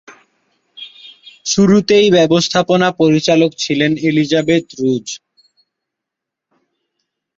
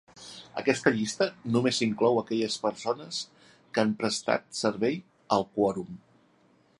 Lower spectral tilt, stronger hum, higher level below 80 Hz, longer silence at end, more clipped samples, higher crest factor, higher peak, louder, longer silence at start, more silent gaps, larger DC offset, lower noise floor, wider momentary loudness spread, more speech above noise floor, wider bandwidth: about the same, -5 dB/octave vs -4.5 dB/octave; neither; first, -54 dBFS vs -68 dBFS; first, 2.2 s vs 0.8 s; neither; second, 14 dB vs 22 dB; first, -2 dBFS vs -6 dBFS; first, -13 LUFS vs -28 LUFS; about the same, 0.1 s vs 0.15 s; neither; neither; first, -82 dBFS vs -64 dBFS; first, 19 LU vs 13 LU; first, 69 dB vs 36 dB; second, 7.8 kHz vs 11.5 kHz